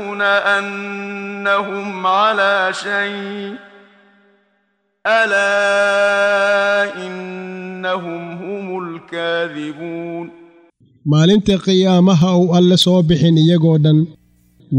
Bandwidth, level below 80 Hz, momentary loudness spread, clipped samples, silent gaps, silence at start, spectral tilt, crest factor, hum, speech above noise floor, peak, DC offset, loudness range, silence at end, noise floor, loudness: 11.5 kHz; -50 dBFS; 15 LU; under 0.1%; none; 0 s; -6 dB/octave; 14 dB; none; 50 dB; -2 dBFS; under 0.1%; 11 LU; 0 s; -65 dBFS; -15 LUFS